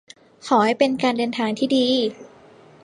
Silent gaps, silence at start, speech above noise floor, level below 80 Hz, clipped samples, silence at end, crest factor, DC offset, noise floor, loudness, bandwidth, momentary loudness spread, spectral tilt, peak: none; 0.45 s; 28 dB; -68 dBFS; under 0.1%; 0.6 s; 18 dB; under 0.1%; -48 dBFS; -20 LUFS; 11.5 kHz; 5 LU; -4.5 dB/octave; -4 dBFS